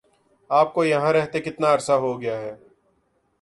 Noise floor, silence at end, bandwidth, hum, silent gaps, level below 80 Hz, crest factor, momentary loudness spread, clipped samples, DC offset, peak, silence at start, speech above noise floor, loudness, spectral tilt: -67 dBFS; 0.85 s; 11.5 kHz; none; none; -64 dBFS; 18 dB; 10 LU; under 0.1%; under 0.1%; -6 dBFS; 0.5 s; 46 dB; -22 LUFS; -5.5 dB/octave